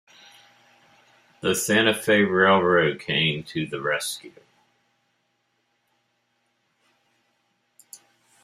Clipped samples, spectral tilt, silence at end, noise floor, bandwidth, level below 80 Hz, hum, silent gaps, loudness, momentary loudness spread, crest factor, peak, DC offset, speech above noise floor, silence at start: under 0.1%; -4 dB/octave; 4.15 s; -72 dBFS; 16 kHz; -66 dBFS; none; none; -21 LUFS; 12 LU; 24 dB; -2 dBFS; under 0.1%; 50 dB; 1.45 s